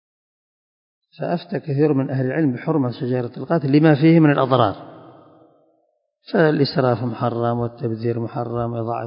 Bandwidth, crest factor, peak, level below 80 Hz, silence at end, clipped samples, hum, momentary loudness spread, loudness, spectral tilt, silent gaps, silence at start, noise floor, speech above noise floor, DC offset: 5.4 kHz; 20 dB; 0 dBFS; -58 dBFS; 0 s; under 0.1%; none; 11 LU; -19 LUFS; -12.5 dB/octave; none; 1.2 s; -67 dBFS; 48 dB; under 0.1%